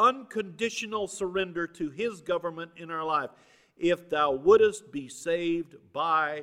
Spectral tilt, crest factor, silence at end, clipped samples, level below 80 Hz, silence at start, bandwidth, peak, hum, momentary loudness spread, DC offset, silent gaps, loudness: -4 dB/octave; 20 dB; 0 s; under 0.1%; -64 dBFS; 0 s; 13 kHz; -8 dBFS; none; 15 LU; under 0.1%; none; -28 LUFS